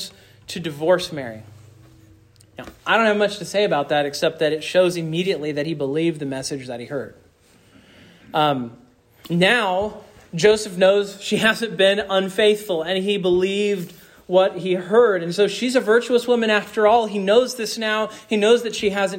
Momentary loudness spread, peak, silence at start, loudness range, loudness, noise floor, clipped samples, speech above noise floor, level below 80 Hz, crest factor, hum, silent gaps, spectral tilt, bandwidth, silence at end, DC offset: 13 LU; -4 dBFS; 0 s; 7 LU; -20 LUFS; -54 dBFS; under 0.1%; 35 dB; -58 dBFS; 16 dB; none; none; -4.5 dB/octave; 16.5 kHz; 0 s; under 0.1%